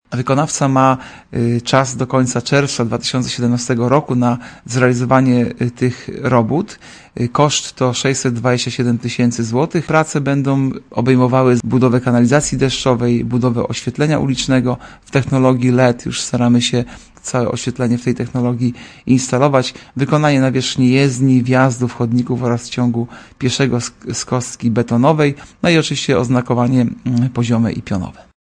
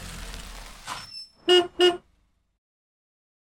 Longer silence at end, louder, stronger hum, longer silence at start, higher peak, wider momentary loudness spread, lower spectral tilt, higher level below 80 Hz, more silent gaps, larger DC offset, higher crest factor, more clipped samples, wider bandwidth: second, 0.45 s vs 1.6 s; first, -16 LUFS vs -21 LUFS; neither; about the same, 0.1 s vs 0 s; first, 0 dBFS vs -8 dBFS; second, 8 LU vs 20 LU; first, -5.5 dB/octave vs -3 dB/octave; about the same, -44 dBFS vs -48 dBFS; neither; neither; about the same, 16 dB vs 20 dB; neither; second, 10.5 kHz vs 16 kHz